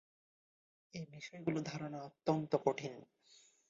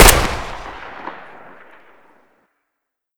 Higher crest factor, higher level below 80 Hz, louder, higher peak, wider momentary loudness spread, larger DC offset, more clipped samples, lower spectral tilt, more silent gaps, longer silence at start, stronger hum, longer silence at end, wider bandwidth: first, 24 dB vs 18 dB; second, -78 dBFS vs -24 dBFS; second, -40 LUFS vs -19 LUFS; second, -18 dBFS vs 0 dBFS; second, 15 LU vs 25 LU; neither; second, under 0.1% vs 0.3%; first, -6 dB/octave vs -2.5 dB/octave; neither; first, 0.95 s vs 0 s; neither; second, 0.35 s vs 2.05 s; second, 7.6 kHz vs over 20 kHz